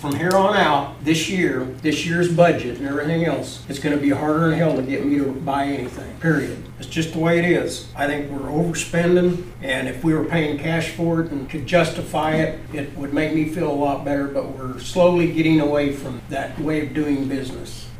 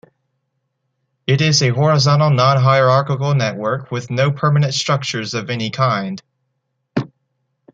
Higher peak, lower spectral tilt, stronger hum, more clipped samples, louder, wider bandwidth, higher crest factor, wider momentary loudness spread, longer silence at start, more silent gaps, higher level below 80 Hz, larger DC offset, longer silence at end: about the same, -2 dBFS vs 0 dBFS; about the same, -6 dB/octave vs -5 dB/octave; neither; neither; second, -21 LUFS vs -16 LUFS; first, 16 kHz vs 7.8 kHz; about the same, 18 dB vs 16 dB; about the same, 11 LU vs 12 LU; second, 0 s vs 1.3 s; neither; first, -42 dBFS vs -56 dBFS; first, 0.1% vs under 0.1%; second, 0 s vs 0.7 s